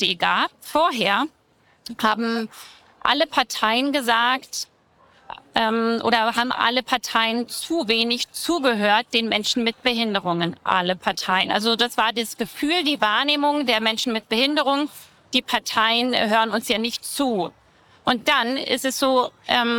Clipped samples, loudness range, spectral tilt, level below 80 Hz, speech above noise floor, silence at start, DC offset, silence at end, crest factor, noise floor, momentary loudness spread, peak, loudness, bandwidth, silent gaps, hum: under 0.1%; 2 LU; -3 dB/octave; -60 dBFS; 35 dB; 0 s; under 0.1%; 0 s; 18 dB; -56 dBFS; 7 LU; -4 dBFS; -21 LUFS; 19 kHz; none; none